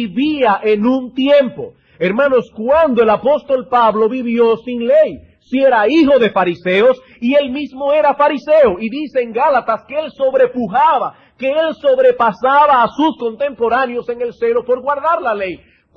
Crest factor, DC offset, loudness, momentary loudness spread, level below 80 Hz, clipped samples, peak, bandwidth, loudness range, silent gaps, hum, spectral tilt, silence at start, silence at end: 12 dB; under 0.1%; -14 LUFS; 9 LU; -52 dBFS; under 0.1%; -2 dBFS; 6.6 kHz; 2 LU; none; none; -7 dB/octave; 0 s; 0.4 s